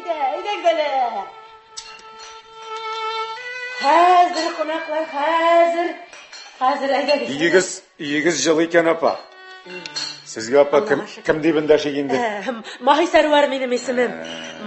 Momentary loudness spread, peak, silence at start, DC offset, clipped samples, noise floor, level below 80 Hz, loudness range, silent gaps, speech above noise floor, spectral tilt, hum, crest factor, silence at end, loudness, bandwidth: 20 LU; -2 dBFS; 0 s; under 0.1%; under 0.1%; -41 dBFS; -60 dBFS; 4 LU; none; 23 dB; -3.5 dB/octave; none; 18 dB; 0 s; -19 LUFS; 8.6 kHz